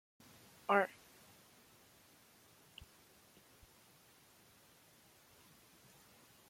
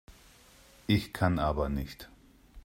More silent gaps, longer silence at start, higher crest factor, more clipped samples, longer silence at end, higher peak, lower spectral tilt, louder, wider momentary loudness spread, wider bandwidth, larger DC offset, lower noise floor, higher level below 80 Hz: neither; first, 0.7 s vs 0.1 s; first, 30 dB vs 20 dB; neither; first, 5.65 s vs 0.05 s; about the same, -16 dBFS vs -14 dBFS; second, -4.5 dB/octave vs -6.5 dB/octave; second, -36 LUFS vs -30 LUFS; first, 29 LU vs 18 LU; about the same, 16.5 kHz vs 16 kHz; neither; first, -66 dBFS vs -58 dBFS; second, -78 dBFS vs -44 dBFS